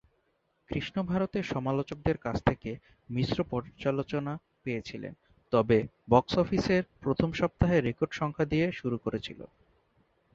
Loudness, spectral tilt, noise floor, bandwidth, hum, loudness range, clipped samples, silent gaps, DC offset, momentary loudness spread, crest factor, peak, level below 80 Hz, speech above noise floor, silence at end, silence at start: -30 LUFS; -7.5 dB/octave; -74 dBFS; 7.6 kHz; none; 5 LU; under 0.1%; none; under 0.1%; 12 LU; 24 dB; -8 dBFS; -50 dBFS; 45 dB; 0.9 s; 0.7 s